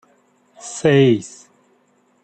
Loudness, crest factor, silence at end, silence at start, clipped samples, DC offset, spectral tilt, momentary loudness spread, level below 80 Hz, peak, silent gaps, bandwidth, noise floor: -16 LUFS; 18 dB; 0.95 s; 0.65 s; under 0.1%; under 0.1%; -6 dB/octave; 23 LU; -62 dBFS; -4 dBFS; none; 9 kHz; -60 dBFS